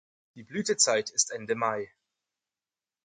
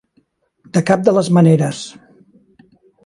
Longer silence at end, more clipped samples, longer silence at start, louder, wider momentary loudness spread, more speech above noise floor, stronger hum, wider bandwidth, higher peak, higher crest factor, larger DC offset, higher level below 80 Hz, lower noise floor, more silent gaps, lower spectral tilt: about the same, 1.2 s vs 1.15 s; neither; second, 0.35 s vs 0.75 s; second, -27 LUFS vs -14 LUFS; about the same, 14 LU vs 15 LU; first, over 61 dB vs 47 dB; neither; about the same, 10.5 kHz vs 11.5 kHz; second, -8 dBFS vs 0 dBFS; first, 24 dB vs 16 dB; neither; second, -76 dBFS vs -60 dBFS; first, under -90 dBFS vs -61 dBFS; neither; second, -1.5 dB/octave vs -7 dB/octave